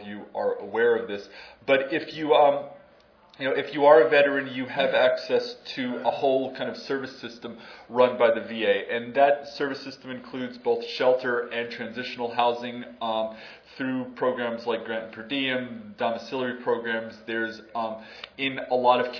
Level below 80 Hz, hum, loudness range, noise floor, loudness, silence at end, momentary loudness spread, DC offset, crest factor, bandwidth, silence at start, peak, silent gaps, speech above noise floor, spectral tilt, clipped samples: -70 dBFS; none; 7 LU; -56 dBFS; -25 LUFS; 0 s; 15 LU; under 0.1%; 22 dB; 5.4 kHz; 0 s; -4 dBFS; none; 31 dB; -5.5 dB/octave; under 0.1%